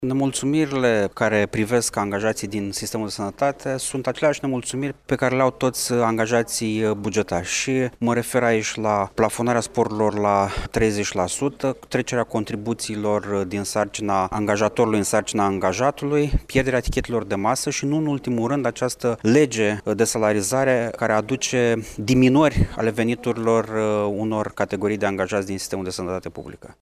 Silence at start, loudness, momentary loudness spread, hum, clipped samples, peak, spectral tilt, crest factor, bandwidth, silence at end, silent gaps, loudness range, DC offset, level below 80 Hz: 0 s; -22 LUFS; 6 LU; none; under 0.1%; -4 dBFS; -5 dB/octave; 18 dB; 15.5 kHz; 0.1 s; none; 3 LU; under 0.1%; -40 dBFS